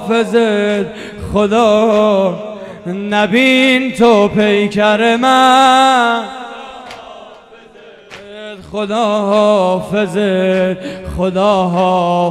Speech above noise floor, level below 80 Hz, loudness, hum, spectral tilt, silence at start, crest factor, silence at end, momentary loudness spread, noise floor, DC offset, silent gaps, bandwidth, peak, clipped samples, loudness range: 27 dB; -42 dBFS; -12 LUFS; none; -5 dB/octave; 0 s; 12 dB; 0 s; 18 LU; -39 dBFS; under 0.1%; none; 14.5 kHz; 0 dBFS; under 0.1%; 7 LU